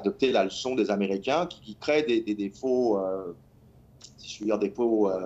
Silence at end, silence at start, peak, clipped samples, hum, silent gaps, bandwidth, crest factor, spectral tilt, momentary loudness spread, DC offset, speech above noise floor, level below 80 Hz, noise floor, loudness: 0 s; 0 s; -10 dBFS; under 0.1%; none; none; 8.2 kHz; 16 dB; -5.5 dB/octave; 10 LU; under 0.1%; 29 dB; -62 dBFS; -55 dBFS; -27 LUFS